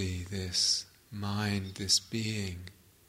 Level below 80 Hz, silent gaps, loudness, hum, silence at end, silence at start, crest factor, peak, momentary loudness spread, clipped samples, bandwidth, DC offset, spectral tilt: -58 dBFS; none; -31 LUFS; none; 0.35 s; 0 s; 20 dB; -14 dBFS; 15 LU; under 0.1%; 16 kHz; under 0.1%; -3 dB/octave